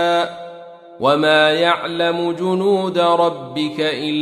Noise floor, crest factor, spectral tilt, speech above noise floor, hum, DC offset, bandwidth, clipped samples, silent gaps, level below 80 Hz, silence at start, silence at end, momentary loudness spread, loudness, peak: -37 dBFS; 16 dB; -5 dB/octave; 21 dB; none; under 0.1%; 14 kHz; under 0.1%; none; -66 dBFS; 0 s; 0 s; 10 LU; -17 LUFS; -2 dBFS